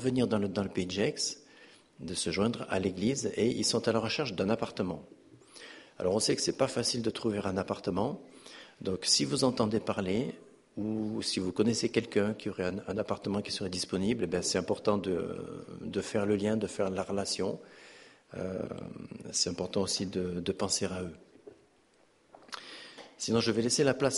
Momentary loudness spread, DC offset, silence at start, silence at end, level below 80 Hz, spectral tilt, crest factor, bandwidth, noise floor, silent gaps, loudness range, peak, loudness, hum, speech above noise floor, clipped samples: 16 LU; under 0.1%; 0 s; 0 s; -62 dBFS; -4 dB/octave; 20 dB; 11.5 kHz; -66 dBFS; none; 4 LU; -12 dBFS; -32 LUFS; none; 34 dB; under 0.1%